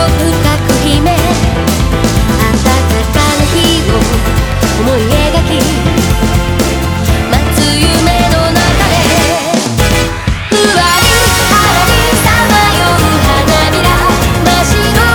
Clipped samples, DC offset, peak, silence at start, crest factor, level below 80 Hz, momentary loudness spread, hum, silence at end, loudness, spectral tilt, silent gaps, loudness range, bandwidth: under 0.1%; under 0.1%; 0 dBFS; 0 s; 8 dB; -16 dBFS; 5 LU; none; 0 s; -9 LUFS; -4.5 dB/octave; none; 3 LU; over 20 kHz